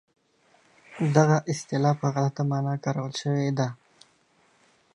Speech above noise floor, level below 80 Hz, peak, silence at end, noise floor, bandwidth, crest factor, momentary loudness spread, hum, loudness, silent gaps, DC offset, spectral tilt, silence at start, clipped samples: 39 dB; -72 dBFS; -4 dBFS; 1.2 s; -64 dBFS; 11 kHz; 24 dB; 8 LU; none; -26 LUFS; none; under 0.1%; -6.5 dB/octave; 0.9 s; under 0.1%